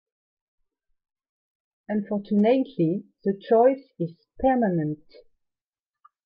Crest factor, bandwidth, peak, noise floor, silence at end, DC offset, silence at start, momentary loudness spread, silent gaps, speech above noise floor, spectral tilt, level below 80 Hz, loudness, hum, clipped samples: 18 dB; 5.2 kHz; -8 dBFS; under -90 dBFS; 1.3 s; under 0.1%; 1.9 s; 13 LU; none; over 67 dB; -11 dB/octave; -58 dBFS; -24 LUFS; none; under 0.1%